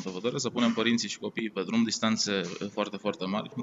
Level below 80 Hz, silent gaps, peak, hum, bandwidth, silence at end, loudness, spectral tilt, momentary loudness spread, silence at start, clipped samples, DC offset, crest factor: -74 dBFS; none; -10 dBFS; none; 8 kHz; 0 s; -29 LUFS; -4 dB/octave; 7 LU; 0 s; under 0.1%; under 0.1%; 20 dB